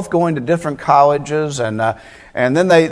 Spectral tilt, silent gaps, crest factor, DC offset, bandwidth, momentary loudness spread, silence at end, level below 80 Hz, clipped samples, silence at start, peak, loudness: -6 dB/octave; none; 16 dB; under 0.1%; 11 kHz; 8 LU; 0 s; -50 dBFS; under 0.1%; 0 s; 0 dBFS; -15 LUFS